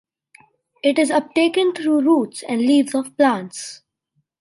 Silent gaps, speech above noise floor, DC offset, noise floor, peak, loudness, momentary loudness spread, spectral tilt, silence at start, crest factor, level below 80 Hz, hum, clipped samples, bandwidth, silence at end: none; 53 dB; under 0.1%; -70 dBFS; -4 dBFS; -18 LUFS; 9 LU; -4 dB/octave; 0.85 s; 16 dB; -72 dBFS; none; under 0.1%; 11.5 kHz; 0.65 s